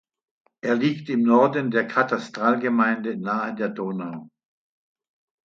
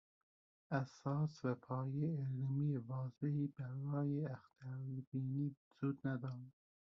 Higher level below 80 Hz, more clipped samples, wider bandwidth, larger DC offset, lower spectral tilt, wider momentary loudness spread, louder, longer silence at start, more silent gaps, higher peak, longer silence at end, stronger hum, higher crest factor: first, -72 dBFS vs -80 dBFS; neither; about the same, 7.2 kHz vs 6.8 kHz; neither; second, -7 dB/octave vs -9.5 dB/octave; first, 12 LU vs 7 LU; first, -23 LUFS vs -43 LUFS; about the same, 0.65 s vs 0.7 s; second, none vs 5.07-5.12 s, 5.57-5.71 s; first, -4 dBFS vs -26 dBFS; first, 1.2 s vs 0.35 s; neither; about the same, 20 dB vs 16 dB